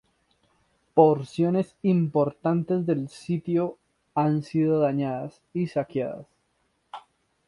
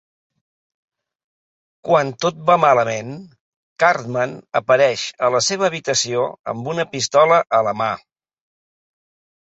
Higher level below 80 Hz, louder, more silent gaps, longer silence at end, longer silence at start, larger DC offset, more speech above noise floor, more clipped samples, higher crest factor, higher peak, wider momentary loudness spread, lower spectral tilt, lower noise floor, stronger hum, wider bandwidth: about the same, -66 dBFS vs -64 dBFS; second, -25 LUFS vs -18 LUFS; second, none vs 3.40-3.76 s, 6.39-6.44 s; second, 0.5 s vs 1.6 s; second, 0.95 s vs 1.85 s; neither; second, 47 dB vs over 72 dB; neither; about the same, 22 dB vs 18 dB; about the same, -4 dBFS vs -2 dBFS; first, 14 LU vs 11 LU; first, -9 dB/octave vs -3.5 dB/octave; second, -71 dBFS vs under -90 dBFS; neither; first, 11 kHz vs 8.2 kHz